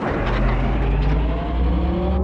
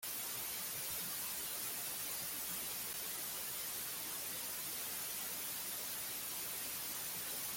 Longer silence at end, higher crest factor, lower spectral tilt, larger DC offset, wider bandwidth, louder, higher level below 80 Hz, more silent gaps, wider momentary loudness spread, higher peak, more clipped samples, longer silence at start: about the same, 0 s vs 0 s; about the same, 10 dB vs 14 dB; first, -9 dB/octave vs 0 dB/octave; neither; second, 5.6 kHz vs 17 kHz; first, -21 LUFS vs -40 LUFS; first, -20 dBFS vs -72 dBFS; neither; about the same, 2 LU vs 1 LU; first, -8 dBFS vs -30 dBFS; neither; about the same, 0 s vs 0 s